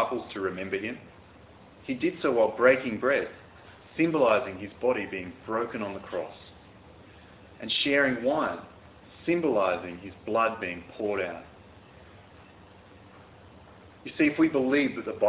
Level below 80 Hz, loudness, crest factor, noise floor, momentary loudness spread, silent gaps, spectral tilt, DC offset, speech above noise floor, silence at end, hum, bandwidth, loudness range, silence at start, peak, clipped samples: -60 dBFS; -27 LUFS; 20 dB; -52 dBFS; 18 LU; none; -9 dB/octave; under 0.1%; 25 dB; 0 s; none; 4 kHz; 8 LU; 0 s; -8 dBFS; under 0.1%